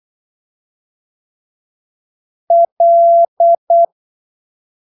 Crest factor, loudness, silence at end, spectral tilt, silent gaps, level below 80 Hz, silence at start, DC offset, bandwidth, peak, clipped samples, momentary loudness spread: 10 dB; -11 LUFS; 0.95 s; -8 dB/octave; 2.72-2.77 s, 3.28-3.37 s, 3.58-3.67 s; -88 dBFS; 2.5 s; under 0.1%; 1 kHz; -4 dBFS; under 0.1%; 5 LU